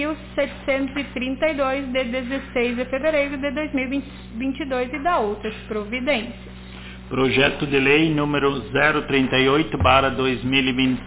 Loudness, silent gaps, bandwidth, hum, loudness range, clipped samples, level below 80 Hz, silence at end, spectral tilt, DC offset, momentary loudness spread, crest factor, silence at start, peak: -21 LUFS; none; 4 kHz; none; 6 LU; under 0.1%; -40 dBFS; 0 s; -9.5 dB/octave; under 0.1%; 12 LU; 20 dB; 0 s; -2 dBFS